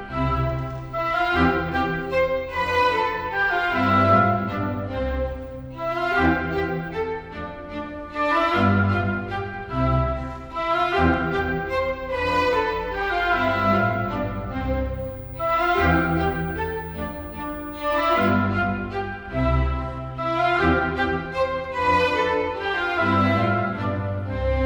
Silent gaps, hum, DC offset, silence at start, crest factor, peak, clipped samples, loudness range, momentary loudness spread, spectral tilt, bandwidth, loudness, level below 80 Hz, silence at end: none; none; under 0.1%; 0 s; 18 dB; -6 dBFS; under 0.1%; 3 LU; 10 LU; -7.5 dB/octave; over 20 kHz; -23 LUFS; -36 dBFS; 0 s